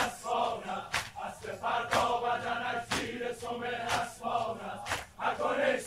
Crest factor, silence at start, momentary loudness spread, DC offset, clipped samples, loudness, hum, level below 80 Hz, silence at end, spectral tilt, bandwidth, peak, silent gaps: 20 dB; 0 s; 8 LU; under 0.1%; under 0.1%; -33 LUFS; none; -60 dBFS; 0 s; -3 dB/octave; 16 kHz; -12 dBFS; none